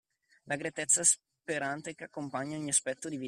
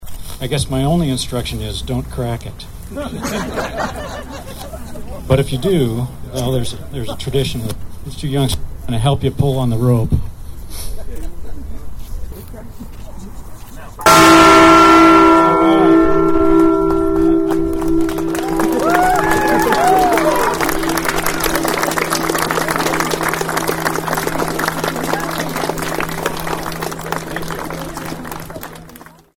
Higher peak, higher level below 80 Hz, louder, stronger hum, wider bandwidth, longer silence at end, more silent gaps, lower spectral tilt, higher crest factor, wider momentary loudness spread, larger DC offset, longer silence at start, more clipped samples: second, -12 dBFS vs 0 dBFS; second, -76 dBFS vs -30 dBFS; second, -30 LUFS vs -15 LUFS; neither; second, 14.5 kHz vs 19.5 kHz; second, 0 s vs 0.35 s; neither; second, -2 dB/octave vs -5 dB/octave; first, 22 dB vs 16 dB; second, 15 LU vs 21 LU; neither; first, 0.45 s vs 0 s; neither